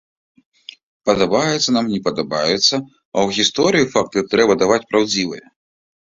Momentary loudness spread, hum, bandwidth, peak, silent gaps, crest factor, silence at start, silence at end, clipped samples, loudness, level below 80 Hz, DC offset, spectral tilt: 8 LU; none; 7.8 kHz; 0 dBFS; 3.05-3.12 s; 18 dB; 1.05 s; 0.7 s; under 0.1%; -17 LUFS; -54 dBFS; under 0.1%; -3.5 dB/octave